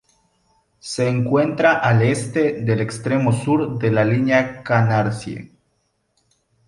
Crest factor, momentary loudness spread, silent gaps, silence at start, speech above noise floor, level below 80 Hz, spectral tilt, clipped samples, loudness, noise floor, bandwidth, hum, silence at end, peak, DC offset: 18 dB; 9 LU; none; 0.85 s; 50 dB; -54 dBFS; -6.5 dB/octave; under 0.1%; -19 LUFS; -68 dBFS; 11.5 kHz; none; 1.25 s; -2 dBFS; under 0.1%